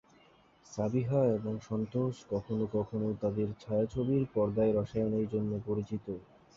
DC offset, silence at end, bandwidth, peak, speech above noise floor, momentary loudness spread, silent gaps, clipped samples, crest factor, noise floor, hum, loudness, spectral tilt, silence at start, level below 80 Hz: under 0.1%; 0.35 s; 7.6 kHz; -16 dBFS; 31 dB; 8 LU; none; under 0.1%; 16 dB; -63 dBFS; none; -33 LUFS; -9 dB/octave; 0.7 s; -58 dBFS